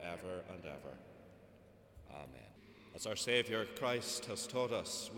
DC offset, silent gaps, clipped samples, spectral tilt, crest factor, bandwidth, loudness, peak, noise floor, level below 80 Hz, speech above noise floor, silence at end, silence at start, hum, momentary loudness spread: under 0.1%; none; under 0.1%; -3 dB/octave; 24 dB; 18 kHz; -39 LUFS; -20 dBFS; -63 dBFS; -70 dBFS; 22 dB; 0 s; 0 s; none; 24 LU